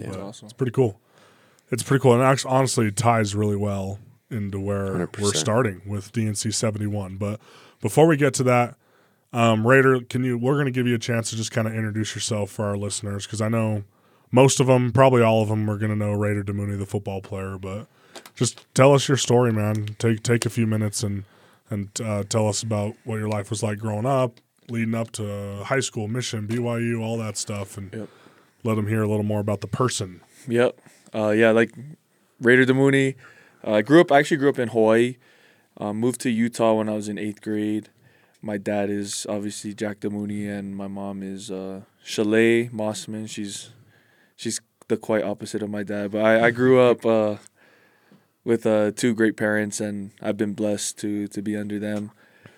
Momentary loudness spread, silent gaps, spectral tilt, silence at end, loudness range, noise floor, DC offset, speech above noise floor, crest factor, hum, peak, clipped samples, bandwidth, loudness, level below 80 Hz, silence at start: 15 LU; none; -5.5 dB/octave; 0.5 s; 7 LU; -61 dBFS; under 0.1%; 39 dB; 20 dB; none; -4 dBFS; under 0.1%; 16 kHz; -23 LUFS; -74 dBFS; 0 s